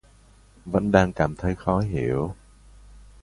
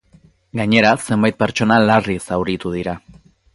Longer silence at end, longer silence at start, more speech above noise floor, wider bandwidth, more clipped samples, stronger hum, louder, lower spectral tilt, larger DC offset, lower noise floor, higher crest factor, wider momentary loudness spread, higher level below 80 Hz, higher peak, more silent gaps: second, 0.2 s vs 0.55 s; about the same, 0.65 s vs 0.55 s; second, 31 dB vs 35 dB; about the same, 11.5 kHz vs 11.5 kHz; neither; neither; second, -24 LUFS vs -17 LUFS; first, -7.5 dB/octave vs -5.5 dB/octave; neither; about the same, -54 dBFS vs -51 dBFS; about the same, 22 dB vs 18 dB; about the same, 13 LU vs 12 LU; first, -40 dBFS vs -46 dBFS; about the same, -2 dBFS vs 0 dBFS; neither